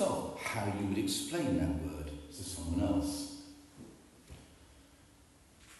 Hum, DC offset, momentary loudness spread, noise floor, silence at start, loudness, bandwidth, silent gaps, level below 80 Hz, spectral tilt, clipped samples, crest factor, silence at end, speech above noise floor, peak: none; under 0.1%; 22 LU; -62 dBFS; 0 s; -36 LUFS; 12.5 kHz; none; -52 dBFS; -5 dB/octave; under 0.1%; 18 dB; 0 s; 27 dB; -20 dBFS